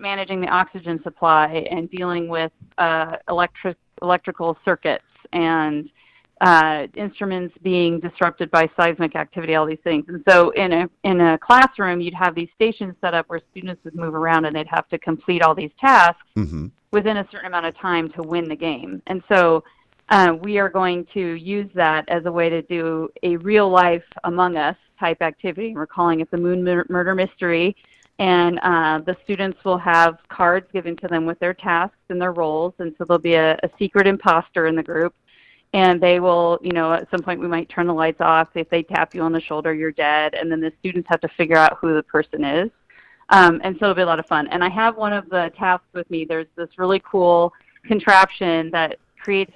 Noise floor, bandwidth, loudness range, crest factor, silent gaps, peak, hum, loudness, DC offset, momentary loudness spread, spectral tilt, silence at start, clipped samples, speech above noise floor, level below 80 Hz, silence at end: -51 dBFS; 11 kHz; 4 LU; 20 dB; none; 0 dBFS; none; -19 LUFS; under 0.1%; 12 LU; -6 dB/octave; 0 s; under 0.1%; 33 dB; -54 dBFS; 0.1 s